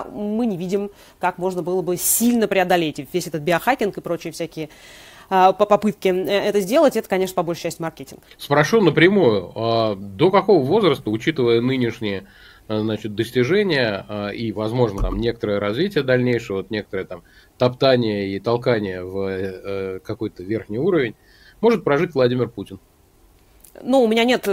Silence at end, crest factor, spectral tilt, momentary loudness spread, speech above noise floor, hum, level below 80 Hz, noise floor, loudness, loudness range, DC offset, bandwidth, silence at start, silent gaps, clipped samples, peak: 0 s; 18 dB; -5 dB/octave; 12 LU; 34 dB; none; -42 dBFS; -54 dBFS; -20 LUFS; 5 LU; under 0.1%; 16 kHz; 0 s; none; under 0.1%; -2 dBFS